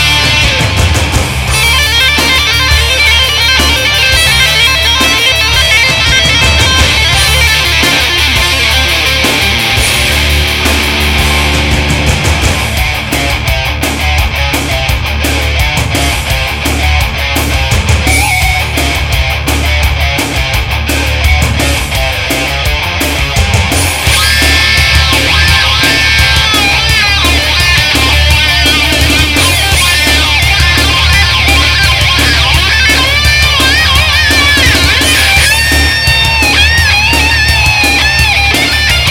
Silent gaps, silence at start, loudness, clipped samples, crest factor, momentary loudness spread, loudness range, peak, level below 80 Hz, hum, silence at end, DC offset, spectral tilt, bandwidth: none; 0 s; -7 LUFS; 0.3%; 8 dB; 6 LU; 5 LU; 0 dBFS; -16 dBFS; none; 0 s; under 0.1%; -2.5 dB/octave; 17 kHz